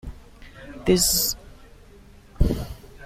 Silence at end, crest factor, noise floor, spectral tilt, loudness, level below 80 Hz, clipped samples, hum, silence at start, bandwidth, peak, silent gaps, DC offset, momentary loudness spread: 0 s; 20 dB; -48 dBFS; -3.5 dB/octave; -22 LUFS; -34 dBFS; under 0.1%; none; 0.05 s; 16.5 kHz; -6 dBFS; none; under 0.1%; 24 LU